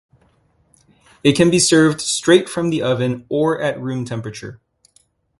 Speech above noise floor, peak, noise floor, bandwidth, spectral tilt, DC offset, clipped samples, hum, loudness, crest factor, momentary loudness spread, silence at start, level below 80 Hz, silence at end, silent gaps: 42 dB; 0 dBFS; -59 dBFS; 11.5 kHz; -4.5 dB/octave; under 0.1%; under 0.1%; none; -17 LUFS; 18 dB; 14 LU; 1.25 s; -52 dBFS; 0.85 s; none